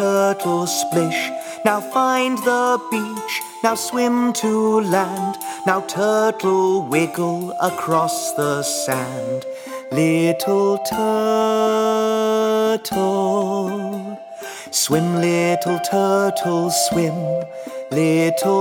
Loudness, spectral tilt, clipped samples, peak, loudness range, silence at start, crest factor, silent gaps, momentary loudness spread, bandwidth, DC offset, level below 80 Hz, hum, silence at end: -19 LUFS; -4.5 dB/octave; under 0.1%; 0 dBFS; 2 LU; 0 s; 18 dB; none; 8 LU; 19.5 kHz; under 0.1%; -62 dBFS; none; 0 s